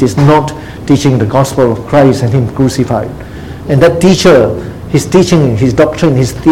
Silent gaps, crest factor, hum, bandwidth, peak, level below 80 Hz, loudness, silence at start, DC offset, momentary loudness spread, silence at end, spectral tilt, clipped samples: none; 8 dB; none; 16 kHz; 0 dBFS; -32 dBFS; -9 LUFS; 0 s; 0.8%; 13 LU; 0 s; -6.5 dB/octave; 1%